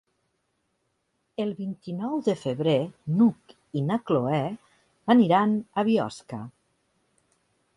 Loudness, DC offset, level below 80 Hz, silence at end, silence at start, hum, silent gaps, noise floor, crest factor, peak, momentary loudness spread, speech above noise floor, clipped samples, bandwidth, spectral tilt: -25 LUFS; under 0.1%; -68 dBFS; 1.25 s; 1.4 s; none; none; -75 dBFS; 18 dB; -8 dBFS; 16 LU; 50 dB; under 0.1%; 11 kHz; -7.5 dB/octave